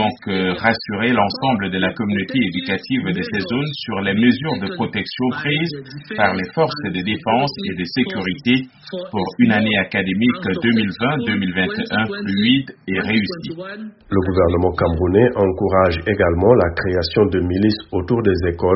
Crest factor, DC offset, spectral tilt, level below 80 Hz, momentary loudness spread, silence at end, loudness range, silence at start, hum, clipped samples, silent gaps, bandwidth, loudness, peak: 18 dB; under 0.1%; -4.5 dB/octave; -40 dBFS; 7 LU; 0 s; 4 LU; 0 s; none; under 0.1%; none; 6 kHz; -18 LUFS; 0 dBFS